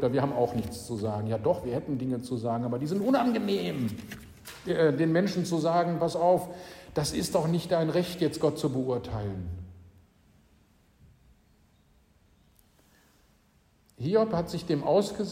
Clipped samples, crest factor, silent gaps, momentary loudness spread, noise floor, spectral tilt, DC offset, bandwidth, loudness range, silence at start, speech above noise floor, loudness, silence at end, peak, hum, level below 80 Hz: under 0.1%; 18 dB; none; 11 LU; -65 dBFS; -6.5 dB/octave; under 0.1%; 16 kHz; 9 LU; 0 s; 37 dB; -28 LUFS; 0 s; -12 dBFS; none; -56 dBFS